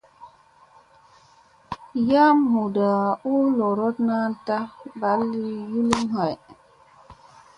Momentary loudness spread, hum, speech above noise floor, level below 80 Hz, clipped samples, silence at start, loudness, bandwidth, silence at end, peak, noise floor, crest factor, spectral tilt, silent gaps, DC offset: 12 LU; none; 34 dB; -60 dBFS; under 0.1%; 0.2 s; -22 LUFS; 11 kHz; 0.45 s; 0 dBFS; -55 dBFS; 22 dB; -6.5 dB/octave; none; under 0.1%